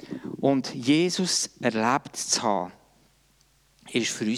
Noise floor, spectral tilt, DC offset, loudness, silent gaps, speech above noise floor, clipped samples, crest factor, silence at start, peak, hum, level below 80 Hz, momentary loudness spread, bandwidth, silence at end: -63 dBFS; -3.5 dB/octave; under 0.1%; -25 LUFS; none; 38 dB; under 0.1%; 18 dB; 0 s; -8 dBFS; none; -68 dBFS; 8 LU; 15.5 kHz; 0 s